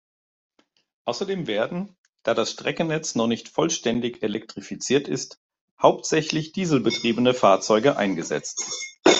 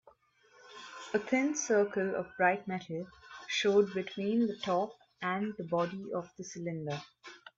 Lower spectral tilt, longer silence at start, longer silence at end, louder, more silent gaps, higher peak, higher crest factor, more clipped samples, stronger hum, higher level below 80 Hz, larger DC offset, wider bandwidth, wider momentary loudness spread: about the same, -4 dB/octave vs -4.5 dB/octave; first, 1.05 s vs 0.65 s; about the same, 0 s vs 0.1 s; first, -23 LUFS vs -33 LUFS; first, 1.98-2.13 s, 5.37-5.50 s, 5.61-5.77 s vs none; first, -2 dBFS vs -14 dBFS; about the same, 22 dB vs 18 dB; neither; neither; first, -64 dBFS vs -76 dBFS; neither; about the same, 8.2 kHz vs 7.8 kHz; second, 12 LU vs 18 LU